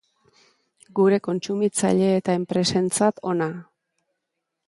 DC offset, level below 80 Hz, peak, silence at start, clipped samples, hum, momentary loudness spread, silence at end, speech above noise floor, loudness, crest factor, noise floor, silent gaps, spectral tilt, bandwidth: under 0.1%; -64 dBFS; -6 dBFS; 0.95 s; under 0.1%; none; 7 LU; 1.05 s; 59 dB; -22 LUFS; 18 dB; -81 dBFS; none; -5 dB/octave; 11.5 kHz